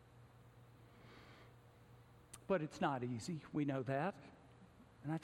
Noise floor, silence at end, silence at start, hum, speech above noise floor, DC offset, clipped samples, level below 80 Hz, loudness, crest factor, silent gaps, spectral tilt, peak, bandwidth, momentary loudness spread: -64 dBFS; 0 s; 0 s; none; 23 dB; under 0.1%; under 0.1%; -74 dBFS; -42 LUFS; 20 dB; none; -6.5 dB/octave; -24 dBFS; 16.5 kHz; 24 LU